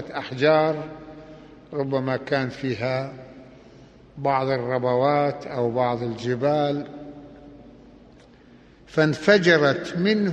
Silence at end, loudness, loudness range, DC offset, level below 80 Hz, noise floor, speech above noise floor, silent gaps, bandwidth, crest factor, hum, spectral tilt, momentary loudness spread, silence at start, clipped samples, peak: 0 s; -23 LUFS; 5 LU; under 0.1%; -58 dBFS; -50 dBFS; 28 dB; none; 9 kHz; 20 dB; none; -6.5 dB/octave; 20 LU; 0 s; under 0.1%; -4 dBFS